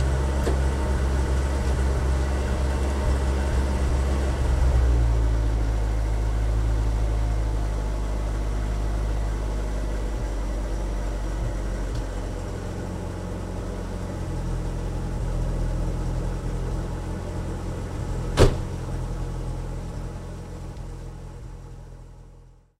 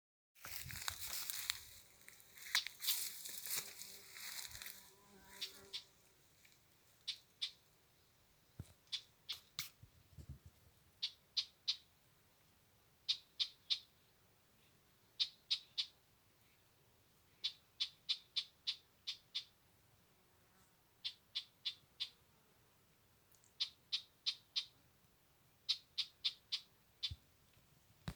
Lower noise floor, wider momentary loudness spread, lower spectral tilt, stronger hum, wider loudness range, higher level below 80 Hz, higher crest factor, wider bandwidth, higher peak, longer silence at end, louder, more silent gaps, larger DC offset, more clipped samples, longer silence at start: second, -49 dBFS vs -72 dBFS; second, 11 LU vs 19 LU; first, -6.5 dB/octave vs 0.5 dB/octave; neither; about the same, 7 LU vs 8 LU; first, -26 dBFS vs -74 dBFS; second, 22 dB vs 34 dB; second, 12 kHz vs over 20 kHz; first, -2 dBFS vs -16 dBFS; first, 0.35 s vs 0 s; first, -27 LUFS vs -44 LUFS; neither; neither; neither; second, 0 s vs 0.35 s